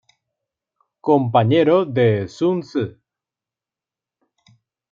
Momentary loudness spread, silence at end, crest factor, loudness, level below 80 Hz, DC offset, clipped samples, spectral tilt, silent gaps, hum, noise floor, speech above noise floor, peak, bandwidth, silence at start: 11 LU; 2 s; 18 dB; -18 LUFS; -64 dBFS; under 0.1%; under 0.1%; -8 dB/octave; none; none; -89 dBFS; 72 dB; -2 dBFS; 7.4 kHz; 1.05 s